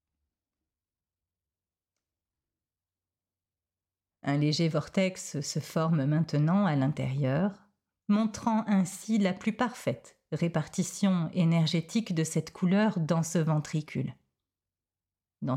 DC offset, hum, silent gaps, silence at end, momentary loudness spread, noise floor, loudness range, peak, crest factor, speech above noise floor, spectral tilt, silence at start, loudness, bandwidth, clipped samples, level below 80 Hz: under 0.1%; none; none; 0 s; 9 LU; under -90 dBFS; 5 LU; -16 dBFS; 14 dB; over 62 dB; -6 dB/octave; 4.25 s; -29 LUFS; 15 kHz; under 0.1%; -68 dBFS